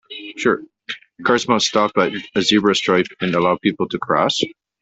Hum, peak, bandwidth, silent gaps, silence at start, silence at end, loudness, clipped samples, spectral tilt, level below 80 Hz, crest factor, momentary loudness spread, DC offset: none; -2 dBFS; 8.4 kHz; none; 0.1 s; 0.3 s; -18 LUFS; under 0.1%; -4 dB/octave; -58 dBFS; 16 dB; 10 LU; under 0.1%